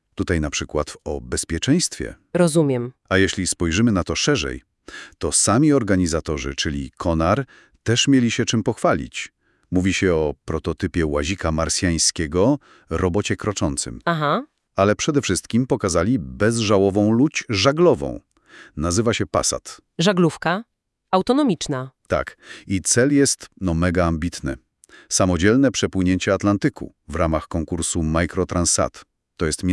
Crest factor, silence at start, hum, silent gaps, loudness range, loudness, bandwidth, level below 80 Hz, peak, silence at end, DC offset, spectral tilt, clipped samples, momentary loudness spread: 20 dB; 0.2 s; none; none; 2 LU; -20 LUFS; 12 kHz; -42 dBFS; 0 dBFS; 0 s; under 0.1%; -4.5 dB/octave; under 0.1%; 11 LU